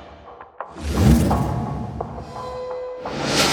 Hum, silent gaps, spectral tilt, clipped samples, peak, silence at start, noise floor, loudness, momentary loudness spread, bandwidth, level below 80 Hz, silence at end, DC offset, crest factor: none; none; -5 dB/octave; under 0.1%; -2 dBFS; 0 s; -42 dBFS; -22 LUFS; 20 LU; 20 kHz; -30 dBFS; 0 s; under 0.1%; 20 dB